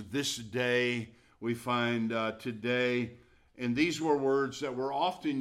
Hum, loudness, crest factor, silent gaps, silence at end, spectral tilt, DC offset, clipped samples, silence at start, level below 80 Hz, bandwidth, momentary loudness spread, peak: none; -32 LUFS; 18 dB; none; 0 s; -4.5 dB/octave; under 0.1%; under 0.1%; 0 s; -68 dBFS; 15.5 kHz; 9 LU; -14 dBFS